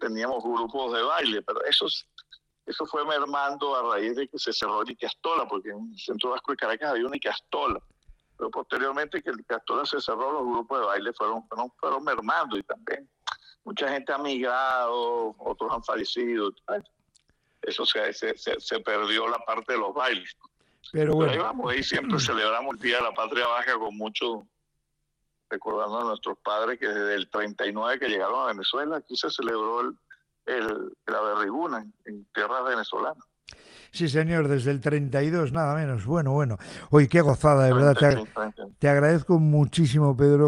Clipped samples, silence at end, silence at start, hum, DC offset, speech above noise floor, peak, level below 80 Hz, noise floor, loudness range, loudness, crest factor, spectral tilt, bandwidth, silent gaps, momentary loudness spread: under 0.1%; 0 s; 0 s; none; under 0.1%; 51 dB; -4 dBFS; -56 dBFS; -77 dBFS; 8 LU; -26 LUFS; 22 dB; -6 dB/octave; 11 kHz; none; 13 LU